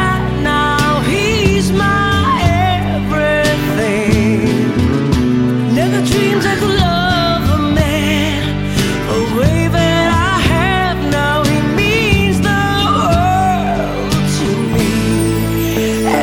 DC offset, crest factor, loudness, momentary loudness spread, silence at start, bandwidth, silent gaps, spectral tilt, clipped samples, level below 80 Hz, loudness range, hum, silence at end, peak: under 0.1%; 12 dB; -13 LUFS; 3 LU; 0 s; 17 kHz; none; -5.5 dB/octave; under 0.1%; -26 dBFS; 1 LU; none; 0 s; 0 dBFS